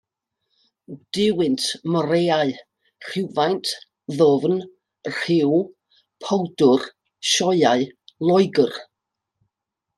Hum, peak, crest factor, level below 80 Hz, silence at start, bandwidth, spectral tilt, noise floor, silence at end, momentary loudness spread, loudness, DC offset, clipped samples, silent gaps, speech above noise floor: none; -4 dBFS; 18 dB; -68 dBFS; 0.9 s; 12.5 kHz; -4.5 dB/octave; -83 dBFS; 1.15 s; 15 LU; -20 LUFS; under 0.1%; under 0.1%; none; 64 dB